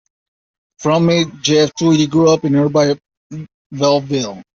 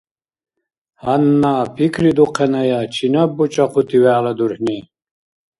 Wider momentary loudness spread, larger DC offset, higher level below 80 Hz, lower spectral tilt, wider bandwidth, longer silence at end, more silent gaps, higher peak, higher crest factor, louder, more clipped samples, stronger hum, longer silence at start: first, 19 LU vs 6 LU; neither; about the same, -54 dBFS vs -54 dBFS; second, -5.5 dB/octave vs -7 dB/octave; second, 7.6 kHz vs 11.5 kHz; second, 0.15 s vs 0.8 s; first, 3.17-3.30 s, 3.54-3.70 s vs none; about the same, -2 dBFS vs 0 dBFS; about the same, 14 dB vs 16 dB; about the same, -15 LUFS vs -16 LUFS; neither; neither; second, 0.8 s vs 1.05 s